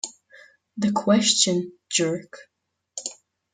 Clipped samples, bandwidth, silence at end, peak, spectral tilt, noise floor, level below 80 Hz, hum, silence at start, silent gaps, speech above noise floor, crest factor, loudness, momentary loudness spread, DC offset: under 0.1%; 9.6 kHz; 0.4 s; -4 dBFS; -3 dB/octave; -53 dBFS; -70 dBFS; none; 0.05 s; none; 30 dB; 22 dB; -22 LUFS; 17 LU; under 0.1%